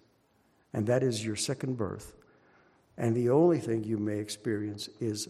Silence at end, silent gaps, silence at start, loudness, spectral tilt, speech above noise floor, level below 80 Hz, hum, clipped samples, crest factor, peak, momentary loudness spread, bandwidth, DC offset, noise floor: 0.05 s; none; 0.75 s; -30 LUFS; -5.5 dB/octave; 39 dB; -66 dBFS; none; under 0.1%; 18 dB; -12 dBFS; 13 LU; 13.5 kHz; under 0.1%; -68 dBFS